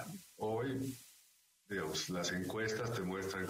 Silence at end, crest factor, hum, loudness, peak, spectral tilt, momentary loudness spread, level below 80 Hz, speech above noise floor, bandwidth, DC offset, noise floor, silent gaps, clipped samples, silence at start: 0 s; 14 dB; none; -40 LUFS; -26 dBFS; -4.5 dB/octave; 8 LU; -70 dBFS; 31 dB; 16 kHz; under 0.1%; -70 dBFS; none; under 0.1%; 0 s